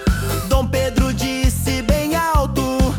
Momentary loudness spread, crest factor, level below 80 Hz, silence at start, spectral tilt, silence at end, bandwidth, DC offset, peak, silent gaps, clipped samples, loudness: 2 LU; 14 dB; -22 dBFS; 0 s; -5.5 dB/octave; 0 s; 18 kHz; under 0.1%; -4 dBFS; none; under 0.1%; -19 LUFS